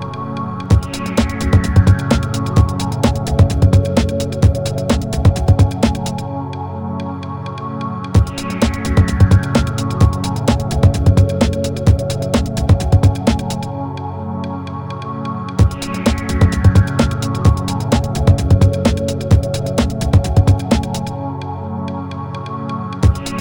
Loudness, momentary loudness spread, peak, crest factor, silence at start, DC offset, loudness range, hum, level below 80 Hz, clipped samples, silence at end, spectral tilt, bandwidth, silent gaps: -16 LUFS; 12 LU; 0 dBFS; 14 dB; 0 s; under 0.1%; 4 LU; none; -24 dBFS; under 0.1%; 0 s; -7 dB/octave; 17.5 kHz; none